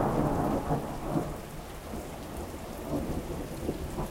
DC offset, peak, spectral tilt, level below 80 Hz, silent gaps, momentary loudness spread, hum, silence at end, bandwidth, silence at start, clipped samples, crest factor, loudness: under 0.1%; -14 dBFS; -6.5 dB/octave; -42 dBFS; none; 11 LU; none; 0 s; 16 kHz; 0 s; under 0.1%; 18 dB; -34 LUFS